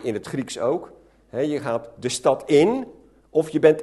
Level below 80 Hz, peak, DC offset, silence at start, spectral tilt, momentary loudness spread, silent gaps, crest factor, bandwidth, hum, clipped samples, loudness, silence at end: -60 dBFS; -2 dBFS; under 0.1%; 0 s; -5 dB/octave; 11 LU; none; 20 dB; 12.5 kHz; none; under 0.1%; -23 LUFS; 0 s